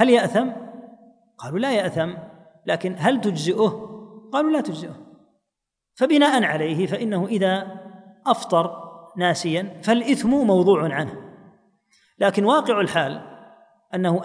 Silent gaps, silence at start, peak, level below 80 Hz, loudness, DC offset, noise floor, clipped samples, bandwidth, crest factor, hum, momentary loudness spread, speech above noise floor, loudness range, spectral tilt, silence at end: none; 0 s; -4 dBFS; -64 dBFS; -21 LUFS; under 0.1%; -83 dBFS; under 0.1%; 10.5 kHz; 18 dB; none; 19 LU; 62 dB; 3 LU; -5.5 dB/octave; 0 s